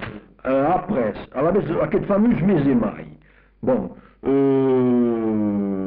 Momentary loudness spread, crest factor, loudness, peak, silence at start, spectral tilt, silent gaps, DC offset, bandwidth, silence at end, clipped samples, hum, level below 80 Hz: 10 LU; 10 dB; -20 LUFS; -10 dBFS; 0 s; -8 dB/octave; none; under 0.1%; 4.6 kHz; 0 s; under 0.1%; none; -46 dBFS